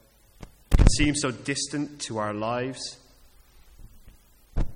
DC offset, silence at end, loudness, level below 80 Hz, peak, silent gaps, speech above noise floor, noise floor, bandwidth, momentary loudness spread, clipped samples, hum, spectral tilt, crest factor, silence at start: under 0.1%; 0 s; -27 LUFS; -30 dBFS; -2 dBFS; none; 26 dB; -55 dBFS; 11.5 kHz; 15 LU; under 0.1%; none; -4.5 dB/octave; 24 dB; 0.4 s